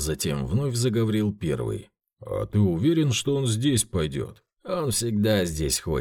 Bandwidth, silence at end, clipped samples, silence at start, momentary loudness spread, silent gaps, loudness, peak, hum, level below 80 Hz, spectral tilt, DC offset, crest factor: 18 kHz; 0 s; under 0.1%; 0 s; 10 LU; none; -25 LUFS; -10 dBFS; none; -44 dBFS; -5 dB/octave; under 0.1%; 16 dB